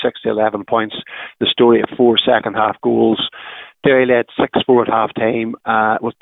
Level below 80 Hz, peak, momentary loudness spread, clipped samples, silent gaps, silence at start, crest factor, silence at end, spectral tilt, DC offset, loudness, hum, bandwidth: -54 dBFS; -2 dBFS; 9 LU; under 0.1%; none; 0 s; 14 dB; 0.1 s; -9 dB/octave; under 0.1%; -15 LUFS; none; 4 kHz